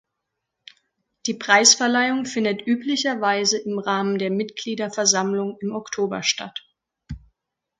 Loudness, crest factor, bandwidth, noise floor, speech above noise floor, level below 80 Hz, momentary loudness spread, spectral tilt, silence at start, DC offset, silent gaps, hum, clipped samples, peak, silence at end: -21 LUFS; 22 dB; 11 kHz; -81 dBFS; 59 dB; -54 dBFS; 16 LU; -2 dB/octave; 1.25 s; under 0.1%; none; none; under 0.1%; 0 dBFS; 0.65 s